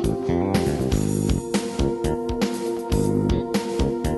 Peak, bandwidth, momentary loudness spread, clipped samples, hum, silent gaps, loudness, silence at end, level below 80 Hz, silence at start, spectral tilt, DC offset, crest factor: -6 dBFS; 12.5 kHz; 3 LU; under 0.1%; none; none; -23 LUFS; 0 s; -32 dBFS; 0 s; -6.5 dB/octave; under 0.1%; 16 dB